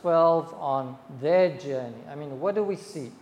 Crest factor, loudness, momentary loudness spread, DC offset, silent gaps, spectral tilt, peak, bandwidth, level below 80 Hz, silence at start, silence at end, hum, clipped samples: 16 dB; -26 LUFS; 17 LU; under 0.1%; none; -7 dB/octave; -10 dBFS; 11 kHz; -76 dBFS; 0.05 s; 0.05 s; none; under 0.1%